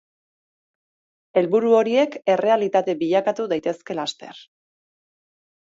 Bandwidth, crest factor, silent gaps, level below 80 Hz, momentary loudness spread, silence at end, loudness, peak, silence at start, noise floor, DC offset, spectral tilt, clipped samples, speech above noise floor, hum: 7.8 kHz; 18 dB; none; -74 dBFS; 11 LU; 1.35 s; -21 LUFS; -4 dBFS; 1.35 s; under -90 dBFS; under 0.1%; -5.5 dB/octave; under 0.1%; over 70 dB; none